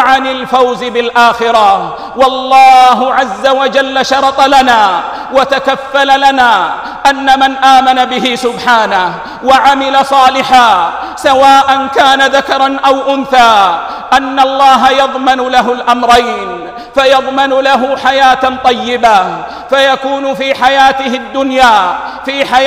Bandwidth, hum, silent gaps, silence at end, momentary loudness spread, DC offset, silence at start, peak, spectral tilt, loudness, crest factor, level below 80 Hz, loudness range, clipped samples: 15.5 kHz; none; none; 0 s; 8 LU; under 0.1%; 0 s; 0 dBFS; -2.5 dB/octave; -8 LUFS; 8 dB; -42 dBFS; 2 LU; 2%